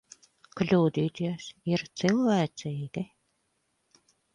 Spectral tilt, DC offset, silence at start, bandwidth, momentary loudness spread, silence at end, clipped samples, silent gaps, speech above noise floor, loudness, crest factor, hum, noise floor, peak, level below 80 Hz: -6.5 dB/octave; under 0.1%; 0.55 s; 10.5 kHz; 13 LU; 1.3 s; under 0.1%; none; 48 dB; -29 LUFS; 20 dB; none; -75 dBFS; -10 dBFS; -66 dBFS